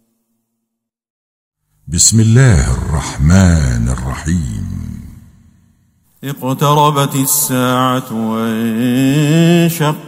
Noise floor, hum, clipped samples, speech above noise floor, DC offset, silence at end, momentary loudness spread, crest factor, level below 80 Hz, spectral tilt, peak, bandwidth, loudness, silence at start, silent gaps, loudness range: -75 dBFS; none; 0.1%; 63 dB; under 0.1%; 0 s; 13 LU; 14 dB; -26 dBFS; -5 dB/octave; 0 dBFS; over 20 kHz; -12 LUFS; 1.85 s; none; 5 LU